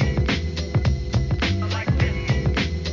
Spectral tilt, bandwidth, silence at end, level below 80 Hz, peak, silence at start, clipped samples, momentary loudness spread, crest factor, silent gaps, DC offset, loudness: -6 dB/octave; 7.6 kHz; 0 s; -26 dBFS; -8 dBFS; 0 s; under 0.1%; 2 LU; 14 dB; none; 0.2%; -23 LUFS